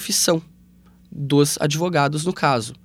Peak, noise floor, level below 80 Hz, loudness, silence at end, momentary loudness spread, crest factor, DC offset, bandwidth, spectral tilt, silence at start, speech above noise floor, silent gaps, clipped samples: -2 dBFS; -51 dBFS; -56 dBFS; -20 LUFS; 0.1 s; 7 LU; 18 dB; under 0.1%; 17 kHz; -4 dB/octave; 0 s; 31 dB; none; under 0.1%